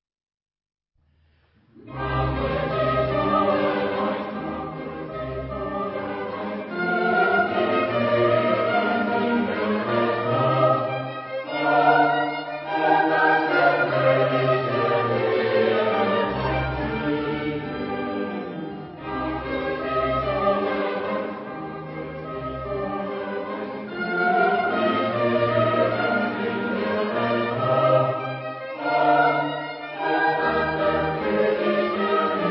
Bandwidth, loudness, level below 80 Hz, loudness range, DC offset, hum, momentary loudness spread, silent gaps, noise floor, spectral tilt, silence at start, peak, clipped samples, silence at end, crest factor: 5.8 kHz; -23 LUFS; -46 dBFS; 7 LU; under 0.1%; none; 12 LU; none; -62 dBFS; -10.5 dB/octave; 1.75 s; -6 dBFS; under 0.1%; 0 s; 18 dB